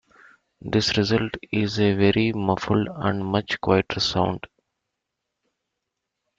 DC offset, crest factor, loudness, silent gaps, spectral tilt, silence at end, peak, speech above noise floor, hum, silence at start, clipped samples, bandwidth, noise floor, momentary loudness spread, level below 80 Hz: under 0.1%; 20 dB; -23 LUFS; none; -5.5 dB/octave; 1.9 s; -4 dBFS; 59 dB; none; 0.65 s; under 0.1%; 7.8 kHz; -82 dBFS; 6 LU; -52 dBFS